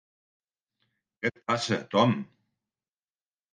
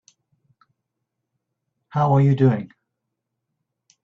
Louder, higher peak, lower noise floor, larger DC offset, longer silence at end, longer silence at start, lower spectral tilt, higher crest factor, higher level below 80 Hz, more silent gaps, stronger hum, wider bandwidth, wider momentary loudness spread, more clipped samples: second, -28 LUFS vs -19 LUFS; about the same, -8 dBFS vs -6 dBFS; first, under -90 dBFS vs -80 dBFS; neither; about the same, 1.3 s vs 1.4 s; second, 1.2 s vs 1.95 s; second, -5.5 dB/octave vs -10 dB/octave; about the same, 24 dB vs 20 dB; second, -74 dBFS vs -60 dBFS; neither; neither; first, 9.6 kHz vs 6.4 kHz; second, 9 LU vs 13 LU; neither